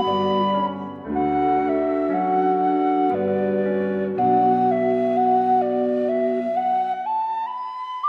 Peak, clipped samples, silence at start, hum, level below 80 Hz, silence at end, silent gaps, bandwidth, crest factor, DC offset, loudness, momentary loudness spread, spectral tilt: -8 dBFS; under 0.1%; 0 s; none; -58 dBFS; 0 s; none; 5.4 kHz; 12 dB; under 0.1%; -21 LUFS; 7 LU; -8.5 dB/octave